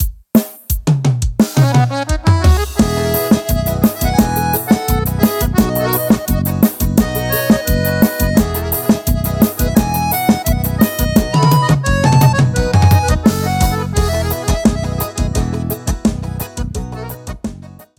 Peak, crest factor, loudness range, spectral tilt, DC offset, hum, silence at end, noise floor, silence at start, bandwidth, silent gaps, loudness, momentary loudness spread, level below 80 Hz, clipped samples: 0 dBFS; 14 dB; 5 LU; -6 dB/octave; under 0.1%; none; 0.15 s; -34 dBFS; 0 s; 19 kHz; none; -15 LUFS; 8 LU; -22 dBFS; under 0.1%